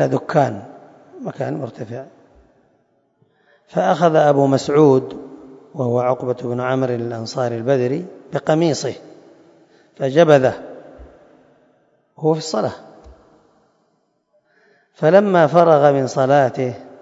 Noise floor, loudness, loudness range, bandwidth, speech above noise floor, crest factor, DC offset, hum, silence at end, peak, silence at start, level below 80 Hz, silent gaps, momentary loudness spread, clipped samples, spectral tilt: -65 dBFS; -17 LUFS; 10 LU; 7.8 kHz; 49 dB; 18 dB; under 0.1%; none; 0.15 s; 0 dBFS; 0 s; -58 dBFS; none; 19 LU; under 0.1%; -6.5 dB/octave